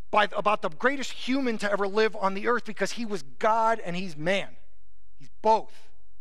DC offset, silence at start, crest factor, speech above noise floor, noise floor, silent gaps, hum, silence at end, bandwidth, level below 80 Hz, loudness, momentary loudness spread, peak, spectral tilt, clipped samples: 3%; 0.15 s; 18 dB; 37 dB; -64 dBFS; none; none; 0.55 s; 13.5 kHz; -66 dBFS; -27 LUFS; 7 LU; -8 dBFS; -4.5 dB/octave; under 0.1%